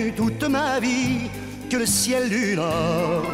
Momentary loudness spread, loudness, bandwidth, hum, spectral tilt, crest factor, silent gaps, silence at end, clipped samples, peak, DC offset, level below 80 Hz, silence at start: 7 LU; -22 LUFS; 16 kHz; none; -4 dB/octave; 12 dB; none; 0 s; under 0.1%; -10 dBFS; under 0.1%; -46 dBFS; 0 s